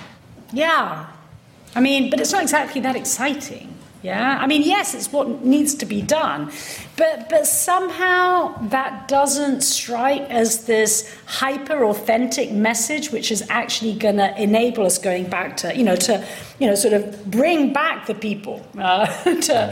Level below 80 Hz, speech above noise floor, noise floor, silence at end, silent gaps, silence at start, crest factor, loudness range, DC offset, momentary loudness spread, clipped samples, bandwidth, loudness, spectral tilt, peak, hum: -58 dBFS; 26 dB; -45 dBFS; 0 s; none; 0 s; 14 dB; 2 LU; under 0.1%; 9 LU; under 0.1%; 16.5 kHz; -19 LUFS; -3 dB/octave; -6 dBFS; none